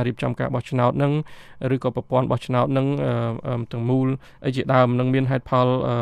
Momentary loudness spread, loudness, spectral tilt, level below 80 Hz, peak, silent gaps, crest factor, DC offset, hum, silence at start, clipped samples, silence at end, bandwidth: 8 LU; -22 LUFS; -8.5 dB/octave; -52 dBFS; -6 dBFS; none; 16 dB; under 0.1%; none; 0 s; under 0.1%; 0 s; 9.6 kHz